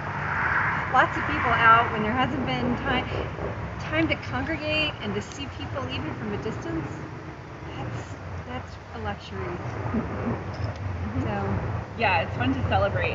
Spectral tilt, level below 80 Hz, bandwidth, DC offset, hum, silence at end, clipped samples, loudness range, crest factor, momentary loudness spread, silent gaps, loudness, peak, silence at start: -6 dB/octave; -44 dBFS; 7.8 kHz; under 0.1%; none; 0 s; under 0.1%; 11 LU; 22 dB; 13 LU; none; -26 LUFS; -6 dBFS; 0 s